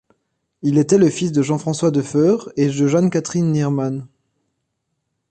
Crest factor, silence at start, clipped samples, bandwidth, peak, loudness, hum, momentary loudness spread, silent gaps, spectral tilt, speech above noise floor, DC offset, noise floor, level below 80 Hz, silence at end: 16 dB; 0.65 s; under 0.1%; 9.6 kHz; -2 dBFS; -18 LUFS; none; 6 LU; none; -7 dB/octave; 57 dB; under 0.1%; -74 dBFS; -58 dBFS; 1.25 s